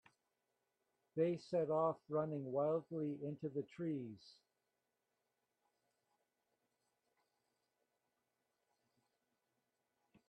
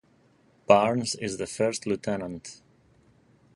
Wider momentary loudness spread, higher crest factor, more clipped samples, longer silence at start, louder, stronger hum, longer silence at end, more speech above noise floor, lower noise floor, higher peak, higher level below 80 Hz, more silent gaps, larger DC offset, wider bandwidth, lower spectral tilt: second, 9 LU vs 20 LU; about the same, 20 dB vs 24 dB; neither; first, 1.15 s vs 0.7 s; second, -41 LUFS vs -26 LUFS; neither; first, 6 s vs 1 s; first, 48 dB vs 34 dB; first, -89 dBFS vs -62 dBFS; second, -26 dBFS vs -4 dBFS; second, -88 dBFS vs -62 dBFS; neither; neither; second, 9 kHz vs 11.5 kHz; first, -9 dB/octave vs -4.5 dB/octave